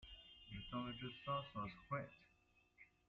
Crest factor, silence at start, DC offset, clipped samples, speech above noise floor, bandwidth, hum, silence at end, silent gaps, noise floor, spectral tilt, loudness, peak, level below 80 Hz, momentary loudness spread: 20 dB; 0 s; under 0.1%; under 0.1%; 29 dB; 7.4 kHz; none; 0.2 s; none; -77 dBFS; -4 dB/octave; -49 LUFS; -32 dBFS; -68 dBFS; 19 LU